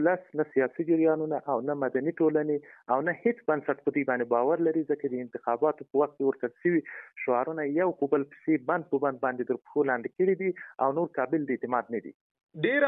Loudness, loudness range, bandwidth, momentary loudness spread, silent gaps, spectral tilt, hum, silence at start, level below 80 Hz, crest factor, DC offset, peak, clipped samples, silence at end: -29 LUFS; 1 LU; 3.9 kHz; 5 LU; 12.14-12.35 s, 12.43-12.47 s; -10.5 dB/octave; none; 0 s; -80 dBFS; 16 dB; under 0.1%; -12 dBFS; under 0.1%; 0 s